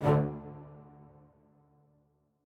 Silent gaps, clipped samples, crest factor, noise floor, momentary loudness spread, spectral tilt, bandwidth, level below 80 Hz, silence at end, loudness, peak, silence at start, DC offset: none; under 0.1%; 20 dB; -71 dBFS; 28 LU; -9.5 dB/octave; 4.7 kHz; -58 dBFS; 1.65 s; -33 LUFS; -14 dBFS; 0 s; under 0.1%